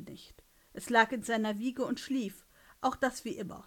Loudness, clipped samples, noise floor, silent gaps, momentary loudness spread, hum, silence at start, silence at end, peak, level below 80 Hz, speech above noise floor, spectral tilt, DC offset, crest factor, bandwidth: -32 LUFS; under 0.1%; -60 dBFS; none; 19 LU; none; 0 s; 0.05 s; -10 dBFS; -64 dBFS; 28 dB; -4 dB/octave; under 0.1%; 24 dB; 17.5 kHz